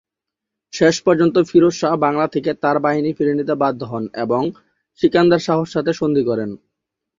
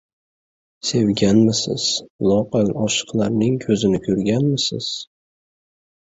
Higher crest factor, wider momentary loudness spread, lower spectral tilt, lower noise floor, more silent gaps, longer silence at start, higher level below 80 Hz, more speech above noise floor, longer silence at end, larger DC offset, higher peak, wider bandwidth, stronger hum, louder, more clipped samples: about the same, 16 dB vs 18 dB; about the same, 10 LU vs 8 LU; about the same, -6 dB/octave vs -5 dB/octave; second, -84 dBFS vs under -90 dBFS; second, none vs 2.10-2.19 s; about the same, 0.75 s vs 0.85 s; second, -56 dBFS vs -50 dBFS; second, 67 dB vs over 71 dB; second, 0.65 s vs 1 s; neither; about the same, -2 dBFS vs -2 dBFS; about the same, 7.6 kHz vs 8 kHz; neither; about the same, -17 LUFS vs -19 LUFS; neither